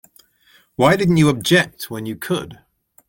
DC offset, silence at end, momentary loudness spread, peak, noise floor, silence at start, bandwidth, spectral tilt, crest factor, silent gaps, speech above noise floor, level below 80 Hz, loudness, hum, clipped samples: under 0.1%; 0.55 s; 14 LU; -2 dBFS; -55 dBFS; 0.8 s; 17 kHz; -5.5 dB/octave; 18 dB; none; 38 dB; -50 dBFS; -18 LUFS; none; under 0.1%